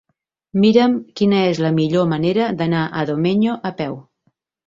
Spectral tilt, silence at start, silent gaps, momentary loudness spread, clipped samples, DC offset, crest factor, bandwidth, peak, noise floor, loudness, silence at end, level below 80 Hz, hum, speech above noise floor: -7.5 dB/octave; 0.55 s; none; 11 LU; under 0.1%; under 0.1%; 16 dB; 7.6 kHz; -2 dBFS; -67 dBFS; -18 LUFS; 0.65 s; -56 dBFS; none; 50 dB